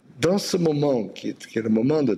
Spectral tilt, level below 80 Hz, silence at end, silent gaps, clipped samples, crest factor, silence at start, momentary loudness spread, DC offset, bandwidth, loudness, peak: -6 dB/octave; -62 dBFS; 0 s; none; under 0.1%; 14 dB; 0.15 s; 9 LU; under 0.1%; 13.5 kHz; -23 LUFS; -8 dBFS